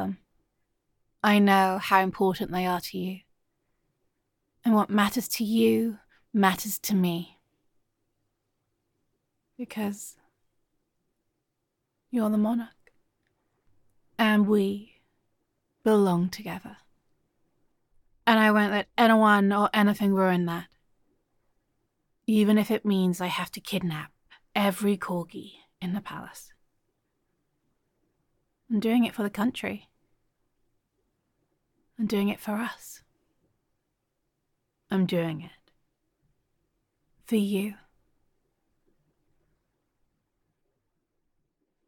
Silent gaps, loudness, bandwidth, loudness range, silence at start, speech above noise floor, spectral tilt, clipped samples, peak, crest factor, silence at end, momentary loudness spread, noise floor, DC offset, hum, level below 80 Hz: none; -25 LUFS; 17.5 kHz; 12 LU; 0 s; 56 dB; -5.5 dB/octave; under 0.1%; -6 dBFS; 24 dB; 4.15 s; 17 LU; -81 dBFS; under 0.1%; none; -68 dBFS